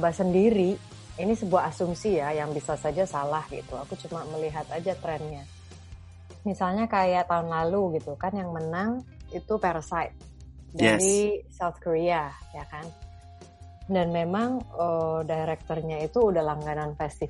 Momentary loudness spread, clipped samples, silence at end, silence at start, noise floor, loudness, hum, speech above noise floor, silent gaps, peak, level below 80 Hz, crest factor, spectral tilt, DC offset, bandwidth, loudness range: 17 LU; under 0.1%; 0 s; 0 s; -48 dBFS; -27 LUFS; none; 21 dB; none; -6 dBFS; -50 dBFS; 20 dB; -5.5 dB/octave; under 0.1%; 11.5 kHz; 5 LU